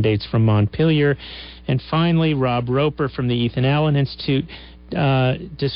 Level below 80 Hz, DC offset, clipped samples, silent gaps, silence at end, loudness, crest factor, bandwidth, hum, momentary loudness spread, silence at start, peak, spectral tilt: -42 dBFS; under 0.1%; under 0.1%; none; 0 s; -19 LUFS; 10 dB; 5.6 kHz; none; 9 LU; 0 s; -8 dBFS; -12 dB/octave